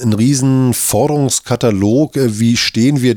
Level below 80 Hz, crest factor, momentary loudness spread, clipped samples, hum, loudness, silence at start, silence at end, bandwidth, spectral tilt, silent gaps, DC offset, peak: -46 dBFS; 10 dB; 2 LU; under 0.1%; none; -13 LUFS; 0 s; 0 s; 19 kHz; -5 dB/octave; none; under 0.1%; -2 dBFS